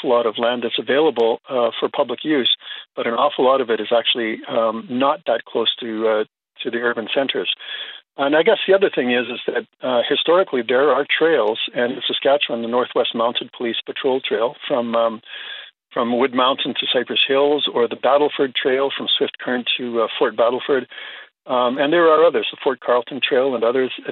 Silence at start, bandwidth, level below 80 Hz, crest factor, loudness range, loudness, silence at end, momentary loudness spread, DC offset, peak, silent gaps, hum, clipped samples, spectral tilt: 0 s; 4.4 kHz; -76 dBFS; 16 dB; 3 LU; -19 LUFS; 0 s; 8 LU; under 0.1%; -2 dBFS; none; none; under 0.1%; -0.5 dB/octave